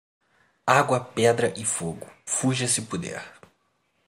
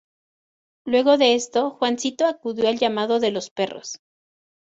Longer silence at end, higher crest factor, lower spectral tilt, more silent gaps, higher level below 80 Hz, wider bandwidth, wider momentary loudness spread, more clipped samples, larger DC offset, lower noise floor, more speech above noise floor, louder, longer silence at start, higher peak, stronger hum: about the same, 0.75 s vs 0.7 s; first, 24 dB vs 18 dB; about the same, -3.5 dB/octave vs -3 dB/octave; second, none vs 3.51-3.56 s; about the same, -64 dBFS vs -68 dBFS; first, 16 kHz vs 8 kHz; about the same, 15 LU vs 15 LU; neither; neither; second, -70 dBFS vs under -90 dBFS; second, 46 dB vs over 69 dB; second, -24 LUFS vs -21 LUFS; second, 0.65 s vs 0.85 s; about the same, -2 dBFS vs -4 dBFS; neither